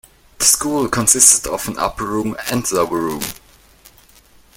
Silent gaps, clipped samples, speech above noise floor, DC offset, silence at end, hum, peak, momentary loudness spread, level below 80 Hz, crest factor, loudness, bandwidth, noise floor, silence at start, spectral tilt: none; under 0.1%; 31 dB; under 0.1%; 1.2 s; none; 0 dBFS; 14 LU; -44 dBFS; 18 dB; -15 LUFS; over 20 kHz; -49 dBFS; 0.4 s; -2 dB/octave